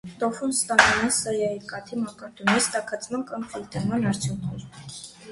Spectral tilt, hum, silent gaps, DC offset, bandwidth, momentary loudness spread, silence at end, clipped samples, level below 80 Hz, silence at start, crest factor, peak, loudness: -3.5 dB/octave; none; none; under 0.1%; 12 kHz; 17 LU; 0 s; under 0.1%; -54 dBFS; 0.05 s; 26 dB; 0 dBFS; -24 LUFS